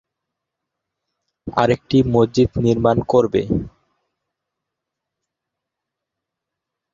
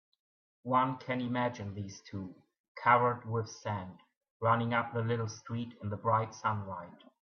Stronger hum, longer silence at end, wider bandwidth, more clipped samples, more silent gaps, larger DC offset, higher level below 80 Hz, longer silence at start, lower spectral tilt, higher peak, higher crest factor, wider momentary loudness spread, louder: neither; first, 3.25 s vs 0.35 s; first, 7.6 kHz vs 6.8 kHz; neither; second, none vs 2.60-2.75 s, 4.17-4.21 s, 4.30-4.40 s; neither; first, -44 dBFS vs -74 dBFS; first, 1.45 s vs 0.65 s; about the same, -7.5 dB/octave vs -6.5 dB/octave; first, -2 dBFS vs -10 dBFS; about the same, 20 dB vs 24 dB; second, 9 LU vs 16 LU; first, -18 LUFS vs -33 LUFS